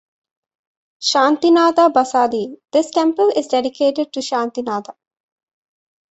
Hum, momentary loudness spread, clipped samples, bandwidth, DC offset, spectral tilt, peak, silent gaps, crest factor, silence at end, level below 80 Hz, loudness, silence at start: none; 10 LU; under 0.1%; 8.2 kHz; under 0.1%; -3 dB/octave; -2 dBFS; none; 16 dB; 1.2 s; -66 dBFS; -17 LUFS; 1 s